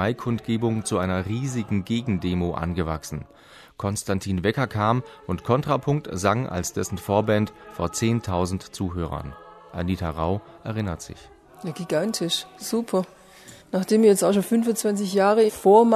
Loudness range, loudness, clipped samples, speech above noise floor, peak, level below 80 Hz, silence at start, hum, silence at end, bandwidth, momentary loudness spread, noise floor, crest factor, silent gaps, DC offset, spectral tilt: 6 LU; -24 LUFS; under 0.1%; 24 dB; -4 dBFS; -48 dBFS; 0 s; none; 0 s; 13.5 kHz; 12 LU; -48 dBFS; 20 dB; none; under 0.1%; -5.5 dB/octave